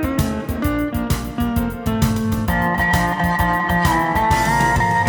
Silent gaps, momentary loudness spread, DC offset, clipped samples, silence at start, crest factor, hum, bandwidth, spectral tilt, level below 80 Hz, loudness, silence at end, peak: none; 6 LU; under 0.1%; under 0.1%; 0 s; 16 dB; none; over 20 kHz; -5.5 dB/octave; -28 dBFS; -18 LUFS; 0 s; -2 dBFS